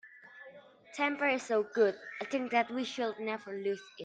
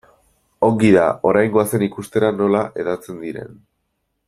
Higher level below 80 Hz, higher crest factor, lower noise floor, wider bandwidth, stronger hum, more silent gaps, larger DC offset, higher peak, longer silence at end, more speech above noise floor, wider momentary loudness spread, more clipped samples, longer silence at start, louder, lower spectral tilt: second, -82 dBFS vs -54 dBFS; about the same, 18 dB vs 16 dB; second, -55 dBFS vs -72 dBFS; second, 9.2 kHz vs 15.5 kHz; neither; neither; neither; second, -16 dBFS vs -2 dBFS; second, 0 s vs 0.75 s; second, 22 dB vs 54 dB; first, 21 LU vs 16 LU; neither; second, 0.05 s vs 0.6 s; second, -33 LUFS vs -17 LUFS; second, -4 dB/octave vs -6.5 dB/octave